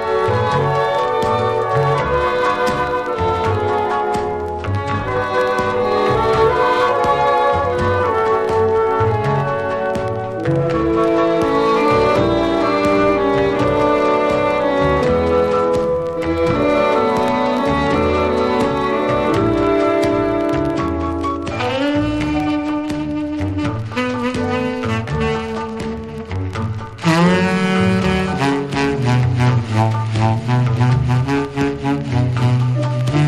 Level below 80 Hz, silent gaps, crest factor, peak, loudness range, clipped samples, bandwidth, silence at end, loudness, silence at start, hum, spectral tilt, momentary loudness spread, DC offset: -36 dBFS; none; 14 dB; -2 dBFS; 5 LU; under 0.1%; 12.5 kHz; 0 s; -17 LUFS; 0 s; none; -7 dB/octave; 6 LU; under 0.1%